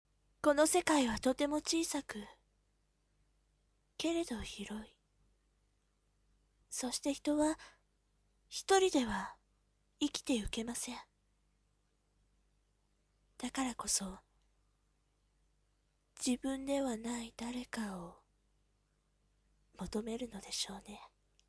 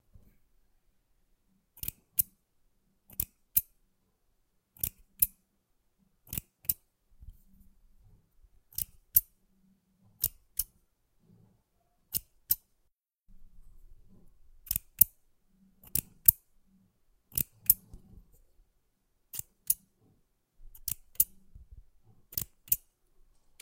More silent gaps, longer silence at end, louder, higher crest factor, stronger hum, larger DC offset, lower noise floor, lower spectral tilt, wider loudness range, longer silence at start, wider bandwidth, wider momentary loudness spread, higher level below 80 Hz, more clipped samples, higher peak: neither; second, 0.45 s vs 0.85 s; second, -36 LUFS vs -30 LUFS; second, 26 dB vs 36 dB; first, 50 Hz at -75 dBFS vs none; neither; about the same, -77 dBFS vs -76 dBFS; first, -3 dB/octave vs -1 dB/octave; about the same, 9 LU vs 10 LU; second, 0.45 s vs 1.85 s; second, 11 kHz vs 17 kHz; first, 18 LU vs 15 LU; second, -62 dBFS vs -56 dBFS; neither; second, -14 dBFS vs 0 dBFS